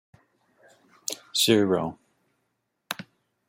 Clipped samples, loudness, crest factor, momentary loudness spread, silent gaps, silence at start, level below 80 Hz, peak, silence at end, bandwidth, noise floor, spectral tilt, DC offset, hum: under 0.1%; -26 LUFS; 24 dB; 16 LU; none; 1.1 s; -68 dBFS; -6 dBFS; 0.45 s; 16.5 kHz; -77 dBFS; -3.5 dB/octave; under 0.1%; none